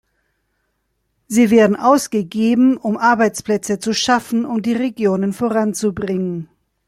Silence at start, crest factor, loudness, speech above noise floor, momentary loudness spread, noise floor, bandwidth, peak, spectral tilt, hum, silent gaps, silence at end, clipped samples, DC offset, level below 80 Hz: 1.3 s; 16 dB; -17 LUFS; 53 dB; 8 LU; -69 dBFS; 15 kHz; -2 dBFS; -5 dB/octave; none; none; 0.4 s; under 0.1%; under 0.1%; -56 dBFS